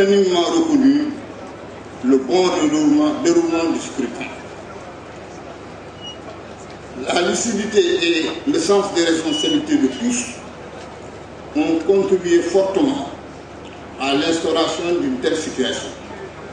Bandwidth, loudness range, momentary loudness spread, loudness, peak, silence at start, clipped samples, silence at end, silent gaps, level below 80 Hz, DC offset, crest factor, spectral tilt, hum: 10 kHz; 7 LU; 19 LU; -18 LUFS; -2 dBFS; 0 s; under 0.1%; 0 s; none; -50 dBFS; under 0.1%; 18 dB; -4 dB/octave; none